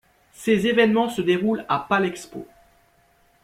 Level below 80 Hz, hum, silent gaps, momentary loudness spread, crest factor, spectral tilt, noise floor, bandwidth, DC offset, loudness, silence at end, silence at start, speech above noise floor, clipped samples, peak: -60 dBFS; none; none; 16 LU; 18 dB; -5.5 dB/octave; -60 dBFS; 15.5 kHz; under 0.1%; -21 LUFS; 1 s; 0.4 s; 39 dB; under 0.1%; -4 dBFS